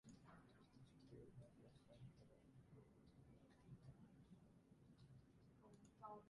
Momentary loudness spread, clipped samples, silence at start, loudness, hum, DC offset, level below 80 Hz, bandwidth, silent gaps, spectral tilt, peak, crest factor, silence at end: 5 LU; under 0.1%; 0.05 s; -67 LUFS; none; under 0.1%; -80 dBFS; 11 kHz; none; -7 dB/octave; -46 dBFS; 20 dB; 0 s